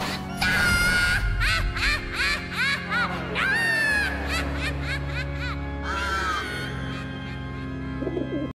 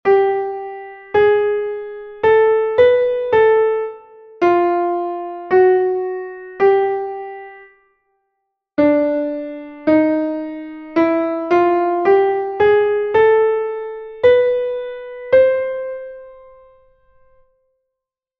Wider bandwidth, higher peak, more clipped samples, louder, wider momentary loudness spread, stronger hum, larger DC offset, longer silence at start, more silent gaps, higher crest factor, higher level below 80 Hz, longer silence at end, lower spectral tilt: first, 16 kHz vs 5.8 kHz; second, -10 dBFS vs -2 dBFS; neither; second, -25 LUFS vs -16 LUFS; second, 12 LU vs 15 LU; neither; neither; about the same, 0 s vs 0.05 s; neither; about the same, 16 dB vs 16 dB; first, -34 dBFS vs -54 dBFS; second, 0.05 s vs 2.05 s; second, -4 dB/octave vs -7.5 dB/octave